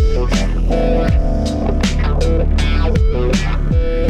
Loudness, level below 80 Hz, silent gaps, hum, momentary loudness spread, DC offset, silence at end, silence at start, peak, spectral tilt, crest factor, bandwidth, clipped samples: -17 LUFS; -16 dBFS; none; none; 2 LU; under 0.1%; 0 s; 0 s; -4 dBFS; -6.5 dB/octave; 8 dB; 9.8 kHz; under 0.1%